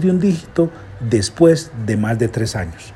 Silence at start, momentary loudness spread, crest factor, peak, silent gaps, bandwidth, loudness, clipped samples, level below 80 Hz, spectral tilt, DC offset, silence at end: 0 s; 9 LU; 16 dB; 0 dBFS; none; 12.5 kHz; -18 LUFS; under 0.1%; -42 dBFS; -6.5 dB/octave; under 0.1%; 0 s